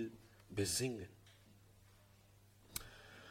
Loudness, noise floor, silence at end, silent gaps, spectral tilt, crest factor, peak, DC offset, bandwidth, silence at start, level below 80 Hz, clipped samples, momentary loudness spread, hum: -42 LUFS; -67 dBFS; 0 s; none; -3.5 dB/octave; 22 dB; -26 dBFS; under 0.1%; 16.5 kHz; 0 s; -68 dBFS; under 0.1%; 26 LU; none